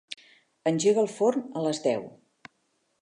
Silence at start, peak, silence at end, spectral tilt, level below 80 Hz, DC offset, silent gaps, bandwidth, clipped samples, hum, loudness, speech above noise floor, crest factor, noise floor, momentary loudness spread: 0.1 s; -10 dBFS; 0.95 s; -5 dB/octave; -76 dBFS; under 0.1%; none; 11 kHz; under 0.1%; none; -26 LUFS; 48 dB; 18 dB; -73 dBFS; 19 LU